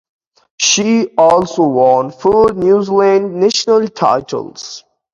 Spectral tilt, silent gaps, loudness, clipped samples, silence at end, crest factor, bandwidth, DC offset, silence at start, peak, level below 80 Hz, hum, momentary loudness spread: -3.5 dB/octave; none; -12 LUFS; under 0.1%; 0.35 s; 12 dB; 7.8 kHz; under 0.1%; 0.6 s; 0 dBFS; -48 dBFS; none; 13 LU